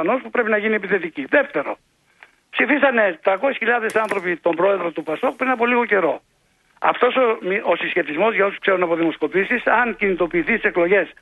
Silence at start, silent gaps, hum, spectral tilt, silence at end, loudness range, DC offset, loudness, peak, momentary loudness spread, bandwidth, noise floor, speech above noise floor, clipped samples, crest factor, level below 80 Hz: 0 s; none; none; -6 dB/octave; 0.1 s; 1 LU; under 0.1%; -19 LUFS; -2 dBFS; 6 LU; 12 kHz; -60 dBFS; 40 dB; under 0.1%; 18 dB; -56 dBFS